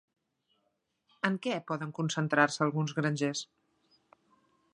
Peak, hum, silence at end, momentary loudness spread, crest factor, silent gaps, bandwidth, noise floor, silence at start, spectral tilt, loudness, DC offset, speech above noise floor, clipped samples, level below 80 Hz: -8 dBFS; none; 1.3 s; 9 LU; 26 dB; none; 10.5 kHz; -79 dBFS; 1.25 s; -5 dB/octave; -31 LUFS; under 0.1%; 48 dB; under 0.1%; -78 dBFS